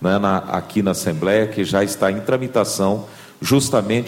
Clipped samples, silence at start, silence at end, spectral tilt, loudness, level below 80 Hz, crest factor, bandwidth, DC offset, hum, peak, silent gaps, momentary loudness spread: under 0.1%; 0 s; 0 s; -5 dB/octave; -19 LUFS; -52 dBFS; 14 dB; 16.5 kHz; under 0.1%; none; -4 dBFS; none; 5 LU